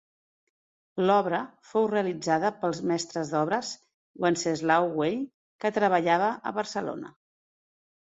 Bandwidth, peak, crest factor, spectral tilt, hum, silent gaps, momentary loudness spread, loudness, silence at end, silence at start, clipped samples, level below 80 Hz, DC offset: 8.2 kHz; -8 dBFS; 20 dB; -5 dB/octave; none; 3.94-4.14 s, 5.34-5.59 s; 12 LU; -27 LUFS; 0.9 s; 0.95 s; under 0.1%; -72 dBFS; under 0.1%